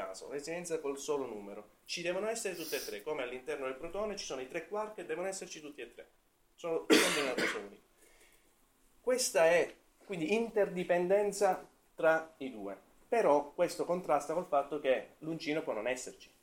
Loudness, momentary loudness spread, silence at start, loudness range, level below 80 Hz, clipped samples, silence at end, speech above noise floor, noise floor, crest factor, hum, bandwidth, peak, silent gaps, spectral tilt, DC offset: -34 LUFS; 16 LU; 0 s; 7 LU; -68 dBFS; under 0.1%; 0.15 s; 34 dB; -68 dBFS; 24 dB; none; 16.5 kHz; -12 dBFS; none; -3 dB/octave; under 0.1%